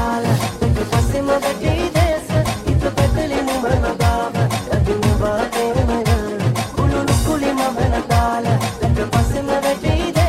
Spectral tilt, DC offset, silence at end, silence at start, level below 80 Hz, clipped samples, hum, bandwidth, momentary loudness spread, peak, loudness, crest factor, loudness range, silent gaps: -6 dB/octave; under 0.1%; 0 s; 0 s; -26 dBFS; under 0.1%; none; 16 kHz; 2 LU; -4 dBFS; -18 LUFS; 14 dB; 0 LU; none